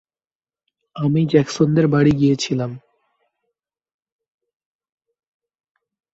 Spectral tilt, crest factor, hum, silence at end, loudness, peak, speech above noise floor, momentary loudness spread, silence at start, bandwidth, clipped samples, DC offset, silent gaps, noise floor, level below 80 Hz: -7 dB/octave; 20 dB; none; 3.35 s; -17 LUFS; -2 dBFS; over 73 dB; 9 LU; 0.95 s; 8 kHz; under 0.1%; under 0.1%; none; under -90 dBFS; -52 dBFS